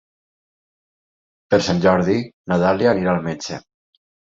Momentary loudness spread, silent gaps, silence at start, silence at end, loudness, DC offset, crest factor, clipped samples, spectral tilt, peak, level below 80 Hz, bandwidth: 12 LU; 2.34-2.44 s; 1.5 s; 0.75 s; -19 LUFS; under 0.1%; 18 dB; under 0.1%; -6 dB/octave; -2 dBFS; -48 dBFS; 7.8 kHz